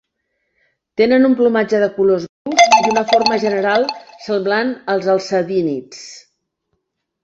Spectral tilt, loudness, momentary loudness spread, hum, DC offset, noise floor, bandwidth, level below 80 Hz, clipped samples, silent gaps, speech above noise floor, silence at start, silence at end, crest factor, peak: -4 dB/octave; -15 LUFS; 13 LU; none; under 0.1%; -71 dBFS; 8 kHz; -60 dBFS; under 0.1%; 2.29-2.45 s; 56 dB; 1 s; 1.05 s; 16 dB; 0 dBFS